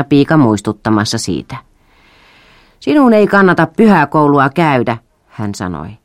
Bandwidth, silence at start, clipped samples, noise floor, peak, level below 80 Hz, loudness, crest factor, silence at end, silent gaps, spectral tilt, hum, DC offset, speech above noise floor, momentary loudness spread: 14.5 kHz; 0 s; under 0.1%; -48 dBFS; 0 dBFS; -46 dBFS; -11 LUFS; 12 dB; 0.1 s; none; -6 dB/octave; none; under 0.1%; 37 dB; 15 LU